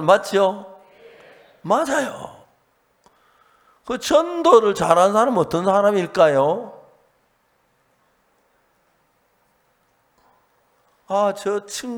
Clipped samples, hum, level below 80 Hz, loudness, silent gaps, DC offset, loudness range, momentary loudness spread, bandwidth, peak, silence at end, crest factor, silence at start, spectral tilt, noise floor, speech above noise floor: under 0.1%; none; -60 dBFS; -18 LUFS; none; under 0.1%; 11 LU; 15 LU; 18 kHz; 0 dBFS; 0 s; 22 dB; 0 s; -4.5 dB/octave; -64 dBFS; 46 dB